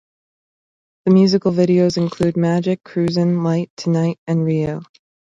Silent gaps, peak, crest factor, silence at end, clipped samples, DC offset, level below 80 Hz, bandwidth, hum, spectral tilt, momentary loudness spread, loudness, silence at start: 3.70-3.77 s, 4.18-4.26 s; -2 dBFS; 16 dB; 0.55 s; under 0.1%; under 0.1%; -54 dBFS; 7.6 kHz; none; -7.5 dB/octave; 7 LU; -17 LUFS; 1.05 s